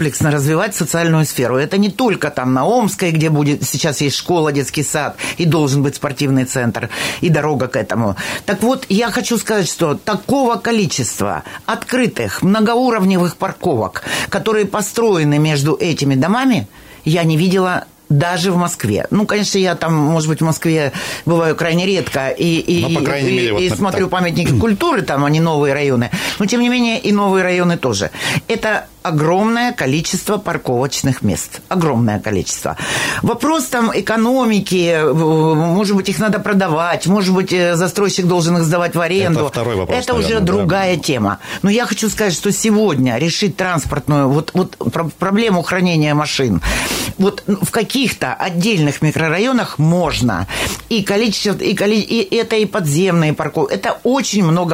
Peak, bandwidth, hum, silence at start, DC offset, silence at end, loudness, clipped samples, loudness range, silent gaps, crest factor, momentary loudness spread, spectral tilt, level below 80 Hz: -4 dBFS; 16.5 kHz; none; 0 s; under 0.1%; 0 s; -15 LUFS; under 0.1%; 2 LU; none; 10 dB; 5 LU; -5 dB/octave; -42 dBFS